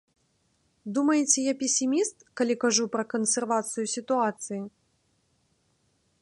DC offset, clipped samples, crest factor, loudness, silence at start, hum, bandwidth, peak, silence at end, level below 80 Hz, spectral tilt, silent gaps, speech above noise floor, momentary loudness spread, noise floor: under 0.1%; under 0.1%; 22 dB; -26 LUFS; 0.85 s; none; 11.5 kHz; -8 dBFS; 1.55 s; -78 dBFS; -2.5 dB/octave; none; 44 dB; 12 LU; -70 dBFS